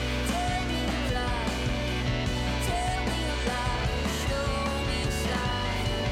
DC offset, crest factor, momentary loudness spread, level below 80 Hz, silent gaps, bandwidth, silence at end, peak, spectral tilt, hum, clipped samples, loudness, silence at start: under 0.1%; 14 dB; 1 LU; -34 dBFS; none; 16 kHz; 0 s; -14 dBFS; -4.5 dB/octave; none; under 0.1%; -29 LUFS; 0 s